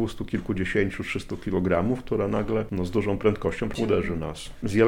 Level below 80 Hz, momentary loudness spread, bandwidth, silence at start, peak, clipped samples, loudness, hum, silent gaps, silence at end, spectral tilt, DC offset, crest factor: -42 dBFS; 7 LU; 16.5 kHz; 0 s; -8 dBFS; under 0.1%; -27 LUFS; none; none; 0 s; -7 dB/octave; under 0.1%; 18 dB